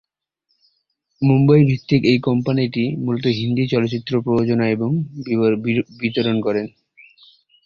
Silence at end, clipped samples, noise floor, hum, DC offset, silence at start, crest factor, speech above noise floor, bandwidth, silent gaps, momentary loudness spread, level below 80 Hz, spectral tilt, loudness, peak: 0.95 s; under 0.1%; -71 dBFS; none; under 0.1%; 1.2 s; 16 dB; 54 dB; 7 kHz; none; 8 LU; -54 dBFS; -8.5 dB/octave; -18 LUFS; -2 dBFS